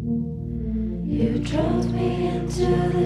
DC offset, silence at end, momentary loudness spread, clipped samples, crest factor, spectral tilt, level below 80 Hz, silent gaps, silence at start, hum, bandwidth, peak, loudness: under 0.1%; 0 s; 6 LU; under 0.1%; 14 dB; -7.5 dB/octave; -34 dBFS; none; 0 s; none; 11.5 kHz; -10 dBFS; -24 LUFS